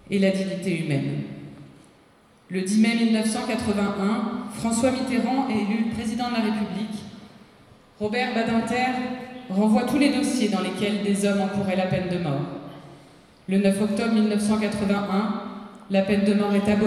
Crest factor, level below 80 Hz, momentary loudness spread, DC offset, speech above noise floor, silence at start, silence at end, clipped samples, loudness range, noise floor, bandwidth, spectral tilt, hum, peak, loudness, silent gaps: 16 dB; -56 dBFS; 11 LU; under 0.1%; 33 dB; 0.1 s; 0 s; under 0.1%; 4 LU; -56 dBFS; 13 kHz; -5.5 dB/octave; none; -8 dBFS; -24 LUFS; none